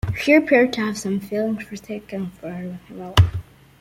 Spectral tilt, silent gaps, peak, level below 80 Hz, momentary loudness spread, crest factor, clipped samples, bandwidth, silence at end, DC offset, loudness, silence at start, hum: -6 dB/octave; none; -2 dBFS; -40 dBFS; 17 LU; 20 dB; under 0.1%; 16 kHz; 0.4 s; under 0.1%; -20 LUFS; 0.05 s; none